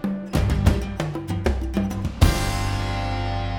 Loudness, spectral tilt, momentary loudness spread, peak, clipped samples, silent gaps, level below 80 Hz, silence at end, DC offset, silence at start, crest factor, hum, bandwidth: -24 LUFS; -6 dB/octave; 6 LU; -2 dBFS; under 0.1%; none; -26 dBFS; 0 s; under 0.1%; 0 s; 20 dB; none; 17.5 kHz